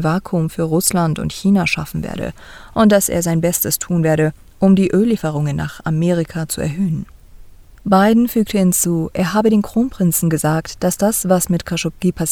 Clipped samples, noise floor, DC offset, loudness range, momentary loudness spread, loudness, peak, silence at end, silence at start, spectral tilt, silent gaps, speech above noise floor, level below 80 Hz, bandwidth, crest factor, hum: under 0.1%; -39 dBFS; under 0.1%; 2 LU; 8 LU; -17 LUFS; 0 dBFS; 0 s; 0 s; -5.5 dB/octave; none; 23 dB; -40 dBFS; 19 kHz; 16 dB; none